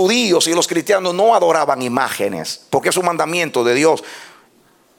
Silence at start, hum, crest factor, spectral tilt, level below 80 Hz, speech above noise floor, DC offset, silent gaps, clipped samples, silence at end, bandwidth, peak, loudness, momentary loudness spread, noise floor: 0 s; none; 16 dB; -3 dB/octave; -64 dBFS; 38 dB; under 0.1%; none; under 0.1%; 0.7 s; 18 kHz; -2 dBFS; -16 LUFS; 8 LU; -54 dBFS